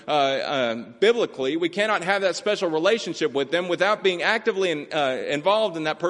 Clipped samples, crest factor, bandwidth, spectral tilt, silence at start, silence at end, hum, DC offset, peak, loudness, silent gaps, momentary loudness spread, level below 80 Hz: under 0.1%; 18 dB; 11.5 kHz; -4 dB/octave; 0.05 s; 0 s; none; under 0.1%; -4 dBFS; -23 LUFS; none; 4 LU; -70 dBFS